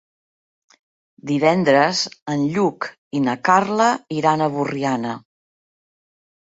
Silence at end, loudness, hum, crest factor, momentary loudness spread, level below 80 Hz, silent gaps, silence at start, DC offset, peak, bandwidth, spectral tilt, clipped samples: 1.4 s; -19 LUFS; none; 20 dB; 11 LU; -64 dBFS; 2.22-2.26 s, 2.98-3.11 s; 1.25 s; under 0.1%; -2 dBFS; 8 kHz; -5 dB/octave; under 0.1%